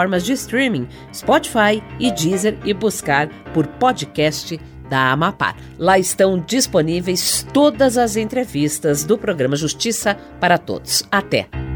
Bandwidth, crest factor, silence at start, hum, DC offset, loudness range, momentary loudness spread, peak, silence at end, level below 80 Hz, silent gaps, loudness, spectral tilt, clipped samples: over 20 kHz; 16 dB; 0 s; none; under 0.1%; 3 LU; 6 LU; -2 dBFS; 0 s; -42 dBFS; none; -18 LUFS; -4 dB/octave; under 0.1%